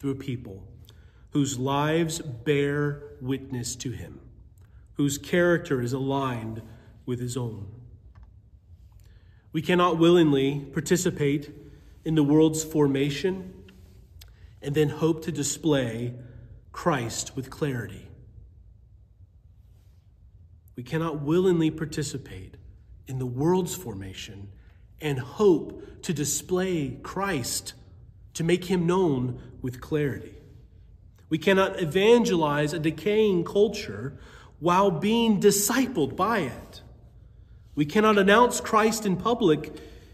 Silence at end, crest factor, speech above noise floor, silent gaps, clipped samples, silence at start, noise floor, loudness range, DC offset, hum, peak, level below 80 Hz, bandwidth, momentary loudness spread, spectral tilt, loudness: 0.05 s; 20 dB; 30 dB; none; under 0.1%; 0 s; -54 dBFS; 9 LU; under 0.1%; none; -6 dBFS; -52 dBFS; 15.5 kHz; 19 LU; -5 dB/octave; -25 LUFS